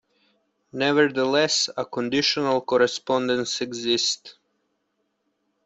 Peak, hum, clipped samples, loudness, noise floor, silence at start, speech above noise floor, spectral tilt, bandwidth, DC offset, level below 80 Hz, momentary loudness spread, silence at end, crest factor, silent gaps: -6 dBFS; none; under 0.1%; -22 LUFS; -74 dBFS; 0.75 s; 51 dB; -3 dB/octave; 8.2 kHz; under 0.1%; -66 dBFS; 7 LU; 1.35 s; 20 dB; none